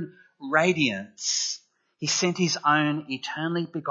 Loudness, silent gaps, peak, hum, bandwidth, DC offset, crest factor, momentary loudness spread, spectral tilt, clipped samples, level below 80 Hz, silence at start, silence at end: -25 LUFS; none; -6 dBFS; none; 8 kHz; under 0.1%; 20 dB; 10 LU; -3.5 dB/octave; under 0.1%; -76 dBFS; 0 s; 0 s